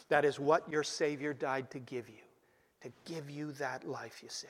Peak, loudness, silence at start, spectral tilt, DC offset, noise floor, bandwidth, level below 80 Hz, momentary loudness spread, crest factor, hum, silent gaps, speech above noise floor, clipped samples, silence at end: -14 dBFS; -36 LUFS; 0 s; -4.5 dB/octave; under 0.1%; -71 dBFS; 14.5 kHz; -80 dBFS; 17 LU; 22 dB; none; none; 35 dB; under 0.1%; 0 s